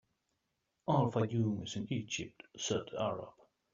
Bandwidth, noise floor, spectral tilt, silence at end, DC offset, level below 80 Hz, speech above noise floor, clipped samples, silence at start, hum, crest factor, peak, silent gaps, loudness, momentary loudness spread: 7.4 kHz; -84 dBFS; -6 dB/octave; 0.45 s; under 0.1%; -70 dBFS; 48 dB; under 0.1%; 0.85 s; none; 20 dB; -18 dBFS; none; -36 LUFS; 13 LU